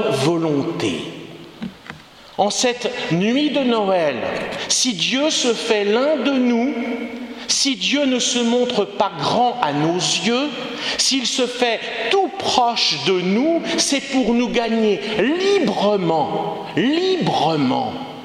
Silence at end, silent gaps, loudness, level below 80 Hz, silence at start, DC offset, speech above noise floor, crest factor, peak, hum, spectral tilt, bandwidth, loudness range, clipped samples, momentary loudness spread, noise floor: 0 s; none; -18 LUFS; -56 dBFS; 0 s; under 0.1%; 20 dB; 18 dB; 0 dBFS; none; -3.5 dB/octave; 14 kHz; 2 LU; under 0.1%; 8 LU; -39 dBFS